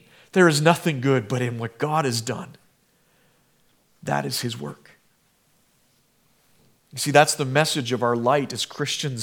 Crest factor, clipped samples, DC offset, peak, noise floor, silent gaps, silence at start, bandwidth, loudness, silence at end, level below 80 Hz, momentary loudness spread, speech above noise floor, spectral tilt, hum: 24 dB; under 0.1%; under 0.1%; 0 dBFS; -64 dBFS; none; 0.35 s; 18.5 kHz; -22 LUFS; 0 s; -72 dBFS; 15 LU; 42 dB; -4.5 dB/octave; none